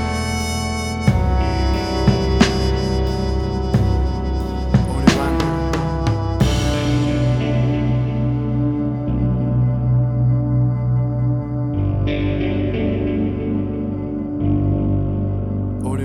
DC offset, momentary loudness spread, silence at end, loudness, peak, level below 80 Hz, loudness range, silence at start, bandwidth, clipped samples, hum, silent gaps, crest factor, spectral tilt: under 0.1%; 5 LU; 0 s; -19 LUFS; 0 dBFS; -26 dBFS; 2 LU; 0 s; 12 kHz; under 0.1%; none; none; 18 dB; -7 dB/octave